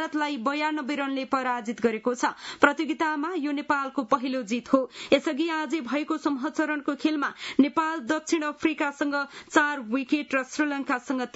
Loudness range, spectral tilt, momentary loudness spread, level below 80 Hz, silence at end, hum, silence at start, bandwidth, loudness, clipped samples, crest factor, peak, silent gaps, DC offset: 1 LU; -3.5 dB/octave; 5 LU; -72 dBFS; 0.05 s; none; 0 s; 8 kHz; -27 LUFS; under 0.1%; 24 dB; -2 dBFS; none; under 0.1%